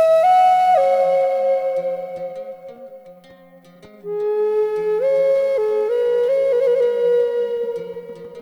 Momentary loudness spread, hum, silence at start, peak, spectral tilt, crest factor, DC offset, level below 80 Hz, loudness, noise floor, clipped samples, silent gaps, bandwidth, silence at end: 19 LU; none; 0 s; -6 dBFS; -4.5 dB/octave; 12 dB; under 0.1%; -64 dBFS; -18 LUFS; -46 dBFS; under 0.1%; none; 11.5 kHz; 0 s